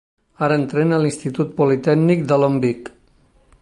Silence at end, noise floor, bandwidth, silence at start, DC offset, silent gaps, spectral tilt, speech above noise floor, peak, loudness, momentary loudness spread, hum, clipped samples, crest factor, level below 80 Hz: 0.75 s; -55 dBFS; 11.5 kHz; 0.4 s; under 0.1%; none; -7.5 dB/octave; 38 dB; -4 dBFS; -18 LUFS; 7 LU; none; under 0.1%; 16 dB; -58 dBFS